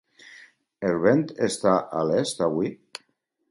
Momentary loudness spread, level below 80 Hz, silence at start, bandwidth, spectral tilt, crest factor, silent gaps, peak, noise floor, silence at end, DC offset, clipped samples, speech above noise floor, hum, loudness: 16 LU; -62 dBFS; 0.3 s; 11.5 kHz; -5.5 dB/octave; 20 dB; none; -6 dBFS; -70 dBFS; 0.75 s; under 0.1%; under 0.1%; 47 dB; none; -24 LUFS